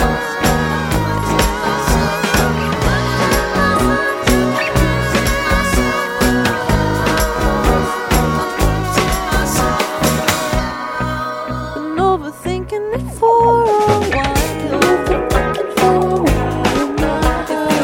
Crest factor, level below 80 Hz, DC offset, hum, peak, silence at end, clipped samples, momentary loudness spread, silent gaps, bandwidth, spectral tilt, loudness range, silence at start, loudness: 16 dB; -24 dBFS; under 0.1%; none; 0 dBFS; 0 s; under 0.1%; 6 LU; none; 17 kHz; -5 dB/octave; 3 LU; 0 s; -16 LUFS